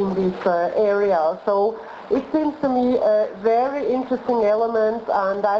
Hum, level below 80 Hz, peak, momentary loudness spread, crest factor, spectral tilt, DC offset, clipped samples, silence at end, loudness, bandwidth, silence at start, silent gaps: none; -56 dBFS; -8 dBFS; 4 LU; 12 dB; -8 dB/octave; under 0.1%; under 0.1%; 0 s; -20 LUFS; 7 kHz; 0 s; none